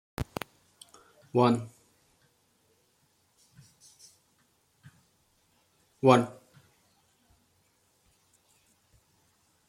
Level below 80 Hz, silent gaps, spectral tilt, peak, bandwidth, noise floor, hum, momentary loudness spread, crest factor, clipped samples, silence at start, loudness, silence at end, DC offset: -60 dBFS; none; -6.5 dB/octave; -6 dBFS; 16 kHz; -70 dBFS; none; 31 LU; 28 dB; under 0.1%; 0.2 s; -27 LUFS; 3.35 s; under 0.1%